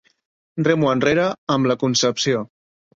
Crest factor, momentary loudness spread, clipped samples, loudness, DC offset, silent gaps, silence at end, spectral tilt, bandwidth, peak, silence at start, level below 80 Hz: 18 dB; 7 LU; under 0.1%; -19 LUFS; under 0.1%; 1.38-1.47 s; 0.5 s; -4.5 dB/octave; 8 kHz; -2 dBFS; 0.55 s; -56 dBFS